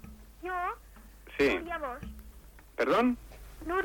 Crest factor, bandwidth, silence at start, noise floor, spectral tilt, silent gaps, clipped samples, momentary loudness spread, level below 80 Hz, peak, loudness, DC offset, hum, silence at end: 16 dB; 19 kHz; 0 s; -52 dBFS; -5.5 dB/octave; none; under 0.1%; 20 LU; -50 dBFS; -16 dBFS; -31 LUFS; under 0.1%; none; 0 s